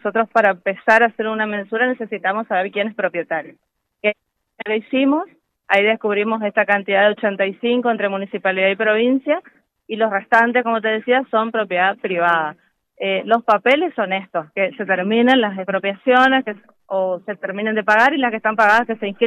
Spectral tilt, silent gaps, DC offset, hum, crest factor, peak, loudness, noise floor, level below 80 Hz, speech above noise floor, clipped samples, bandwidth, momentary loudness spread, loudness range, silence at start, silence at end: -5.5 dB/octave; none; under 0.1%; none; 16 dB; -2 dBFS; -18 LUFS; -40 dBFS; -70 dBFS; 22 dB; under 0.1%; 10 kHz; 9 LU; 4 LU; 0.05 s; 0 s